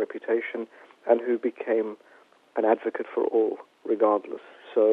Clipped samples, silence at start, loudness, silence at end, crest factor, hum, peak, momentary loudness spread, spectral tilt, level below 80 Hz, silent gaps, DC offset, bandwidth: under 0.1%; 0 s; -26 LUFS; 0 s; 20 dB; none; -6 dBFS; 14 LU; -7 dB/octave; -82 dBFS; none; under 0.1%; 4.1 kHz